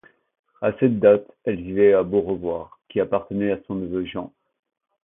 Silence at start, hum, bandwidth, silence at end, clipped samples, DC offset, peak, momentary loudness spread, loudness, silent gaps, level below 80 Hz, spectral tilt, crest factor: 0.6 s; none; 3.8 kHz; 0.75 s; under 0.1%; under 0.1%; -4 dBFS; 12 LU; -22 LUFS; none; -54 dBFS; -12 dB/octave; 20 dB